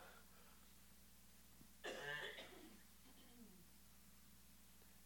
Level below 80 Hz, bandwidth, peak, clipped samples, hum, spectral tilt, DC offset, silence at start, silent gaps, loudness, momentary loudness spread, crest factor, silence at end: -76 dBFS; 17.5 kHz; -38 dBFS; under 0.1%; none; -2.5 dB/octave; under 0.1%; 0 s; none; -58 LUFS; 17 LU; 22 dB; 0 s